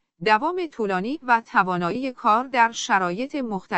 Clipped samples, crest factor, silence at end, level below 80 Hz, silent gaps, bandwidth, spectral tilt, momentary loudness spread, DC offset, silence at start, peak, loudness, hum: under 0.1%; 18 dB; 0 s; -62 dBFS; none; 8.4 kHz; -4.5 dB/octave; 7 LU; under 0.1%; 0.2 s; -6 dBFS; -22 LUFS; none